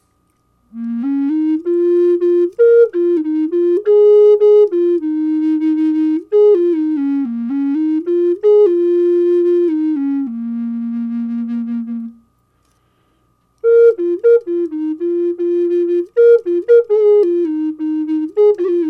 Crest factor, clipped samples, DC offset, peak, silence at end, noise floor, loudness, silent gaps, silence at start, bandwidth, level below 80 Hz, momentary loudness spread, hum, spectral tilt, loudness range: 12 dB; under 0.1%; under 0.1%; -2 dBFS; 0 s; -61 dBFS; -14 LUFS; none; 0.75 s; 4.5 kHz; -66 dBFS; 11 LU; none; -8.5 dB/octave; 6 LU